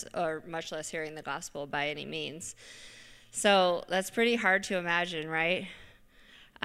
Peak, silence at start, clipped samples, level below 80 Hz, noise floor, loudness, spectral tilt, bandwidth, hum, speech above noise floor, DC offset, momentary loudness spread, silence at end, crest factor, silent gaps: -10 dBFS; 0 s; under 0.1%; -64 dBFS; -57 dBFS; -30 LUFS; -3 dB/octave; 15.5 kHz; none; 26 dB; under 0.1%; 18 LU; 0.2 s; 22 dB; none